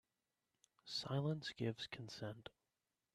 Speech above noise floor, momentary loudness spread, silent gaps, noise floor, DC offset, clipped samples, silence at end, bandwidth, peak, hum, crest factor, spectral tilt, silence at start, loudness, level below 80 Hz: over 45 dB; 16 LU; none; under -90 dBFS; under 0.1%; under 0.1%; 0.65 s; 13 kHz; -30 dBFS; none; 18 dB; -5.5 dB/octave; 0.85 s; -45 LUFS; -80 dBFS